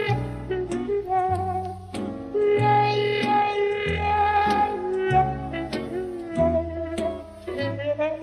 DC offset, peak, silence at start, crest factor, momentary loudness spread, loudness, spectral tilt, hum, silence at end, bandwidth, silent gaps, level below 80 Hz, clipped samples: under 0.1%; -8 dBFS; 0 s; 16 dB; 10 LU; -24 LUFS; -6.5 dB/octave; none; 0 s; 12 kHz; none; -44 dBFS; under 0.1%